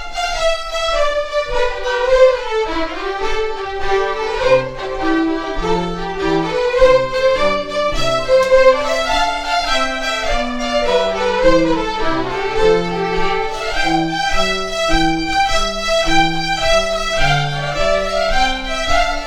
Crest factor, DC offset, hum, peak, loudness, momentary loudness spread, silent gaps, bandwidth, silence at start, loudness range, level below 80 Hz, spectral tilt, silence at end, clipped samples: 16 dB; under 0.1%; none; 0 dBFS; -16 LUFS; 7 LU; none; 12.5 kHz; 0 s; 3 LU; -26 dBFS; -4 dB/octave; 0 s; under 0.1%